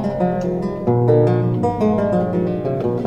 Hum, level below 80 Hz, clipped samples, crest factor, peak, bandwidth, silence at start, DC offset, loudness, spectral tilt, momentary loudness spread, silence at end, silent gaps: none; -42 dBFS; under 0.1%; 14 dB; -4 dBFS; 7.2 kHz; 0 s; under 0.1%; -18 LUFS; -10 dB/octave; 6 LU; 0 s; none